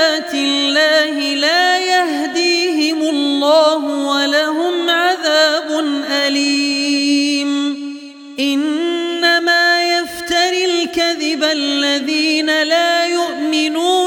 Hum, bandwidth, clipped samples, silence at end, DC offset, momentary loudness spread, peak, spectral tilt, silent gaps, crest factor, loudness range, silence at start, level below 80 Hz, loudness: none; 17 kHz; under 0.1%; 0 s; under 0.1%; 6 LU; -2 dBFS; -0.5 dB/octave; none; 14 dB; 2 LU; 0 s; -60 dBFS; -14 LUFS